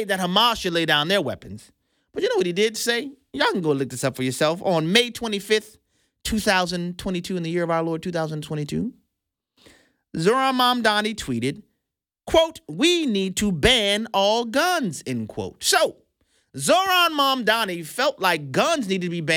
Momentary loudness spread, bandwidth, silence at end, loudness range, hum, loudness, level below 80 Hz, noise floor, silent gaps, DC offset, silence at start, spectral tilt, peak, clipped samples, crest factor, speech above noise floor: 11 LU; 19 kHz; 0 s; 4 LU; none; -22 LUFS; -48 dBFS; -83 dBFS; none; under 0.1%; 0 s; -3.5 dB/octave; -4 dBFS; under 0.1%; 20 dB; 61 dB